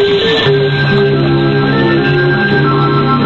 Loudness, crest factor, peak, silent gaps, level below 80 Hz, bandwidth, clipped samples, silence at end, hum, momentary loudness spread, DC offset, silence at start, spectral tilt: -10 LUFS; 8 dB; -2 dBFS; none; -38 dBFS; 6.8 kHz; under 0.1%; 0 s; none; 1 LU; under 0.1%; 0 s; -8 dB/octave